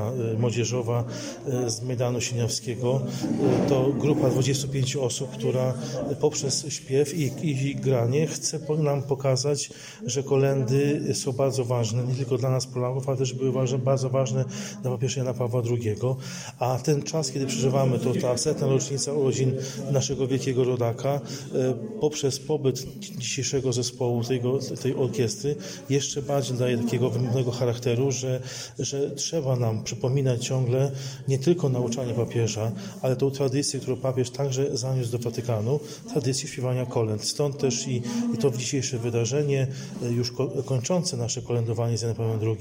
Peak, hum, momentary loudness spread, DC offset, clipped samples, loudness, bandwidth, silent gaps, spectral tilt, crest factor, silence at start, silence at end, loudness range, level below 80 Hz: -10 dBFS; none; 6 LU; under 0.1%; under 0.1%; -26 LUFS; 16 kHz; none; -5.5 dB/octave; 16 dB; 0 s; 0 s; 2 LU; -60 dBFS